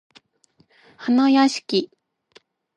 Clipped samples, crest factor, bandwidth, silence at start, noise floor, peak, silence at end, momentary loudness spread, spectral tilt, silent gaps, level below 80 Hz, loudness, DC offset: under 0.1%; 18 dB; 10.5 kHz; 1 s; -62 dBFS; -4 dBFS; 0.9 s; 15 LU; -4 dB/octave; none; -76 dBFS; -19 LUFS; under 0.1%